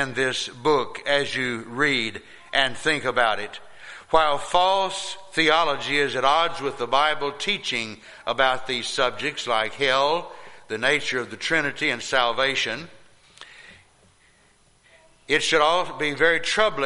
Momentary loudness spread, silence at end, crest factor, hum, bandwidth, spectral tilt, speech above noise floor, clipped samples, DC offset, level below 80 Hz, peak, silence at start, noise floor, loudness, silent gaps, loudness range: 9 LU; 0 s; 20 dB; none; 11.5 kHz; -2.5 dB/octave; 36 dB; under 0.1%; under 0.1%; -54 dBFS; -4 dBFS; 0 s; -59 dBFS; -22 LUFS; none; 5 LU